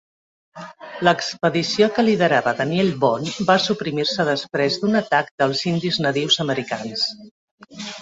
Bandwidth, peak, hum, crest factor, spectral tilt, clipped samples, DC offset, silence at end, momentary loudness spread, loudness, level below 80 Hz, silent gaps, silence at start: 8 kHz; -2 dBFS; none; 18 dB; -4.5 dB/octave; under 0.1%; under 0.1%; 0 s; 8 LU; -20 LUFS; -60 dBFS; 5.31-5.38 s, 7.31-7.58 s; 0.55 s